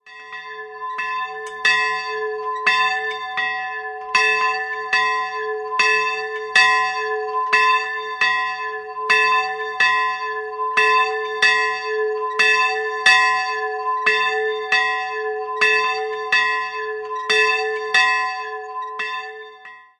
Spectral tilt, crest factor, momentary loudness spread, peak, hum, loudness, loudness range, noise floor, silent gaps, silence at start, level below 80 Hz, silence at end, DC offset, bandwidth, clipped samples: 0.5 dB/octave; 20 dB; 12 LU; 0 dBFS; none; -18 LUFS; 3 LU; -42 dBFS; none; 0.05 s; -68 dBFS; 0.2 s; under 0.1%; 11.5 kHz; under 0.1%